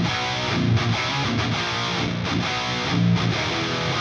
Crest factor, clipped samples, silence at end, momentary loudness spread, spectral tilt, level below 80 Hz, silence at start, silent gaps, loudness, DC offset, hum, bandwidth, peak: 14 dB; under 0.1%; 0 s; 3 LU; -5 dB/octave; -44 dBFS; 0 s; none; -22 LUFS; under 0.1%; none; 8 kHz; -10 dBFS